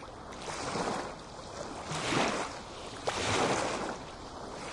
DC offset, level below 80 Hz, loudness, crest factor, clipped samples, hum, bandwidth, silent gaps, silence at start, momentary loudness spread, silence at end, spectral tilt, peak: under 0.1%; -56 dBFS; -34 LUFS; 20 dB; under 0.1%; none; 11.5 kHz; none; 0 s; 14 LU; 0 s; -3.5 dB/octave; -14 dBFS